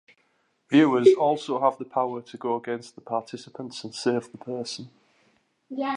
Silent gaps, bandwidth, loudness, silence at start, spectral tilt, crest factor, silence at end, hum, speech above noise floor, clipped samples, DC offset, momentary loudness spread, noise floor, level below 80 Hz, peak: none; 10.5 kHz; -25 LUFS; 0.7 s; -5.5 dB/octave; 22 dB; 0 s; none; 44 dB; under 0.1%; under 0.1%; 18 LU; -69 dBFS; -80 dBFS; -4 dBFS